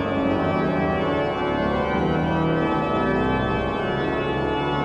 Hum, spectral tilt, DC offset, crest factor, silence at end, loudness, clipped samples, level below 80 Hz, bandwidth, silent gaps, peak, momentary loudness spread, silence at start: none; -8 dB/octave; under 0.1%; 12 dB; 0 s; -23 LUFS; under 0.1%; -40 dBFS; 8.2 kHz; none; -10 dBFS; 2 LU; 0 s